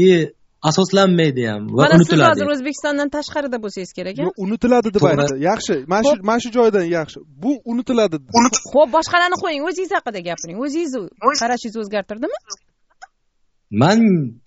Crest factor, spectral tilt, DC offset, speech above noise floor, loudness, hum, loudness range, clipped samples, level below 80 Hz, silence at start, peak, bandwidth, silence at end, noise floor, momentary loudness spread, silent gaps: 18 dB; -5 dB/octave; under 0.1%; 46 dB; -17 LUFS; none; 7 LU; under 0.1%; -52 dBFS; 0 s; 0 dBFS; 8 kHz; 0.15 s; -63 dBFS; 13 LU; none